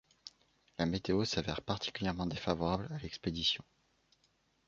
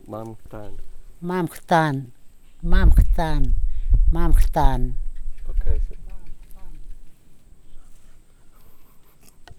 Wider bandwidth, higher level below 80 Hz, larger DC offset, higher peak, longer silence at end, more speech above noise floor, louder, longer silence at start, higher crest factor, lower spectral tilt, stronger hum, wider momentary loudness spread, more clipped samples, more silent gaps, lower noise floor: second, 7.4 kHz vs 12.5 kHz; second, -56 dBFS vs -22 dBFS; neither; second, -14 dBFS vs -2 dBFS; first, 1.05 s vs 0.15 s; first, 39 dB vs 29 dB; second, -36 LUFS vs -24 LUFS; first, 0.25 s vs 0.1 s; first, 24 dB vs 18 dB; second, -4 dB/octave vs -7 dB/octave; neither; second, 15 LU vs 22 LU; neither; neither; first, -75 dBFS vs -45 dBFS